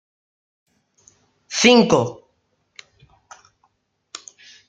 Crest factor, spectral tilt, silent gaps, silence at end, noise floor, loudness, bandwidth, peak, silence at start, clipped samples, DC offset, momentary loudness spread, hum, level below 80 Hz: 22 dB; -3.5 dB/octave; none; 2.55 s; -68 dBFS; -16 LUFS; 9.2 kHz; -2 dBFS; 1.5 s; under 0.1%; under 0.1%; 25 LU; none; -60 dBFS